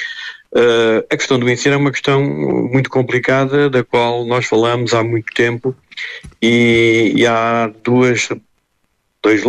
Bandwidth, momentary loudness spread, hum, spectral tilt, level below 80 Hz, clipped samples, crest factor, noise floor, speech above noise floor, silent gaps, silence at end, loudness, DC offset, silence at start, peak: 10.5 kHz; 10 LU; none; -5.5 dB/octave; -52 dBFS; under 0.1%; 12 dB; -65 dBFS; 51 dB; none; 0 s; -14 LUFS; under 0.1%; 0 s; -2 dBFS